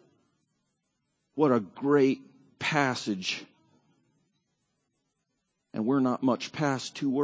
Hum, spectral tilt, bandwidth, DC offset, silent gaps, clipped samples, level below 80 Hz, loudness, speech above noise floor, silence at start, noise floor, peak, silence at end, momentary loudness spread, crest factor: none; -5.5 dB/octave; 8 kHz; under 0.1%; none; under 0.1%; -76 dBFS; -28 LUFS; 53 dB; 1.35 s; -80 dBFS; -8 dBFS; 0 s; 10 LU; 22 dB